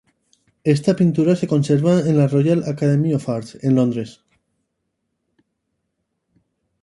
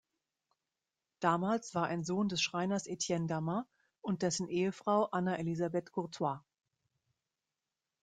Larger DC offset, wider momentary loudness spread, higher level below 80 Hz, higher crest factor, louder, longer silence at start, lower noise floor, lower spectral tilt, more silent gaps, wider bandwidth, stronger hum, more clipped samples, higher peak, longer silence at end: neither; about the same, 8 LU vs 7 LU; first, -60 dBFS vs -74 dBFS; about the same, 18 dB vs 22 dB; first, -18 LUFS vs -35 LUFS; second, 0.65 s vs 1.2 s; second, -74 dBFS vs under -90 dBFS; first, -8 dB/octave vs -5 dB/octave; neither; first, 11.5 kHz vs 9.6 kHz; neither; neither; first, -2 dBFS vs -16 dBFS; first, 2.7 s vs 1.65 s